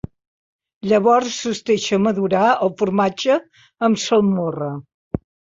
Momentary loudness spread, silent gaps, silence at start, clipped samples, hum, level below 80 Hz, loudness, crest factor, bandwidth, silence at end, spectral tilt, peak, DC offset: 14 LU; 4.94-5.11 s; 0.85 s; under 0.1%; none; -50 dBFS; -18 LUFS; 14 dB; 7.8 kHz; 0.45 s; -5 dB/octave; -4 dBFS; under 0.1%